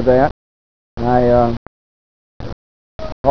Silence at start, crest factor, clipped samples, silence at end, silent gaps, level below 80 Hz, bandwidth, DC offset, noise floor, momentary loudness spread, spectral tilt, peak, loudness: 0 s; 18 dB; under 0.1%; 0 s; 0.31-0.97 s, 1.57-2.40 s, 2.53-2.99 s, 3.12-3.24 s; -34 dBFS; 5.4 kHz; 5%; under -90 dBFS; 21 LU; -9 dB/octave; 0 dBFS; -16 LUFS